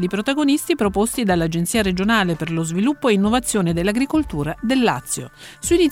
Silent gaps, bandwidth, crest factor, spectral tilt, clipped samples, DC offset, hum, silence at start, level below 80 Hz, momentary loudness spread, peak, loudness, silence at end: none; 17 kHz; 14 dB; -4.5 dB/octave; under 0.1%; under 0.1%; none; 0 s; -40 dBFS; 7 LU; -4 dBFS; -19 LUFS; 0 s